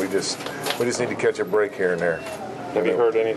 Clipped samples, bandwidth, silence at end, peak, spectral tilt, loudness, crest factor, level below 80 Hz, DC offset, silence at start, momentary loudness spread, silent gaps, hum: under 0.1%; 13 kHz; 0 s; -8 dBFS; -4 dB/octave; -23 LUFS; 16 dB; -62 dBFS; under 0.1%; 0 s; 8 LU; none; none